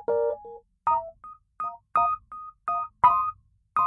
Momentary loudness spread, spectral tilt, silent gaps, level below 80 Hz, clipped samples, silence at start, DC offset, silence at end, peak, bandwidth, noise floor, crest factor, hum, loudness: 21 LU; -6.5 dB/octave; none; -60 dBFS; under 0.1%; 0 s; under 0.1%; 0 s; -6 dBFS; 5.2 kHz; -49 dBFS; 20 dB; none; -26 LUFS